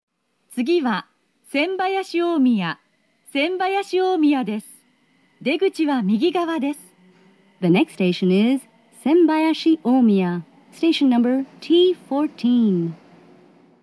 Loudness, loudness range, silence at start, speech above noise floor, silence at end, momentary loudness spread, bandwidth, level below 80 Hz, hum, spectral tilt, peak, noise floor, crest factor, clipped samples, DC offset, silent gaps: -20 LUFS; 4 LU; 0.5 s; 42 dB; 0.9 s; 11 LU; 11 kHz; -84 dBFS; none; -6.5 dB/octave; -6 dBFS; -60 dBFS; 14 dB; under 0.1%; under 0.1%; none